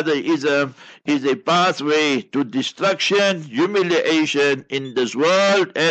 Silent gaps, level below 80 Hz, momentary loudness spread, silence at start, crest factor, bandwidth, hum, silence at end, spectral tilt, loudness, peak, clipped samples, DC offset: none; -68 dBFS; 7 LU; 0 s; 12 dB; 8.8 kHz; none; 0 s; -4 dB/octave; -18 LUFS; -6 dBFS; under 0.1%; under 0.1%